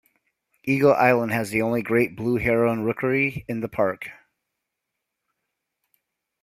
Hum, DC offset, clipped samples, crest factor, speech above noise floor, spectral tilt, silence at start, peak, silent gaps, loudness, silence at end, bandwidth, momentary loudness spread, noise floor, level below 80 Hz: none; under 0.1%; under 0.1%; 22 dB; 60 dB; -7 dB/octave; 0.65 s; -4 dBFS; none; -22 LUFS; 2.3 s; 16 kHz; 11 LU; -82 dBFS; -54 dBFS